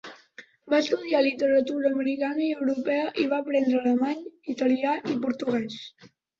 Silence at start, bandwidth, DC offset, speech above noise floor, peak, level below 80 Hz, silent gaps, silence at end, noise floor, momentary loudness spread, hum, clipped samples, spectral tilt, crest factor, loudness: 0.05 s; 7.4 kHz; under 0.1%; 26 dB; -10 dBFS; -70 dBFS; none; 0.35 s; -51 dBFS; 9 LU; none; under 0.1%; -5 dB/octave; 16 dB; -26 LUFS